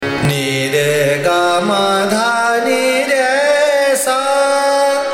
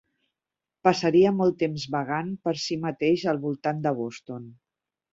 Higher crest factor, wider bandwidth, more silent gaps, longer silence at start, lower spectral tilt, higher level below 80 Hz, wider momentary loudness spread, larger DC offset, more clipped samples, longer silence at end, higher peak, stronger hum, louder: second, 12 dB vs 22 dB; first, 16.5 kHz vs 7.8 kHz; neither; second, 0 s vs 0.85 s; second, -3.5 dB/octave vs -6 dB/octave; first, -50 dBFS vs -66 dBFS; second, 2 LU vs 12 LU; neither; neither; second, 0 s vs 0.6 s; about the same, -2 dBFS vs -4 dBFS; neither; first, -13 LUFS vs -25 LUFS